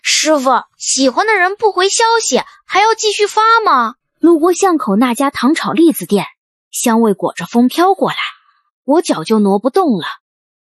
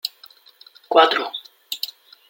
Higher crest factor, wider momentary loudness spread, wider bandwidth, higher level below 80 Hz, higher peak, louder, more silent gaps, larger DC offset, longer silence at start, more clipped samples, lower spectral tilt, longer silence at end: second, 12 dB vs 22 dB; second, 7 LU vs 16 LU; second, 12.5 kHz vs 17 kHz; first, -62 dBFS vs -80 dBFS; about the same, 0 dBFS vs -2 dBFS; first, -13 LUFS vs -20 LUFS; first, 6.38-6.71 s, 8.72-8.83 s vs none; neither; about the same, 0.05 s vs 0.05 s; neither; first, -3.5 dB/octave vs -1 dB/octave; first, 0.65 s vs 0.45 s